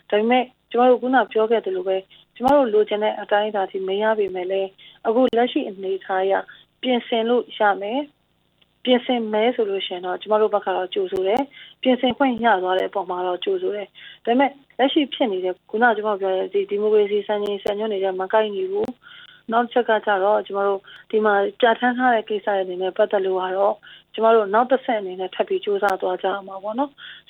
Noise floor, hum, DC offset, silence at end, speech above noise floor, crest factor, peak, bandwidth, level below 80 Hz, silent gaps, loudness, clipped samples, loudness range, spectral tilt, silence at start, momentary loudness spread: -63 dBFS; none; under 0.1%; 0.1 s; 42 dB; 16 dB; -4 dBFS; 6.2 kHz; -66 dBFS; none; -21 LUFS; under 0.1%; 2 LU; -6 dB/octave; 0.1 s; 9 LU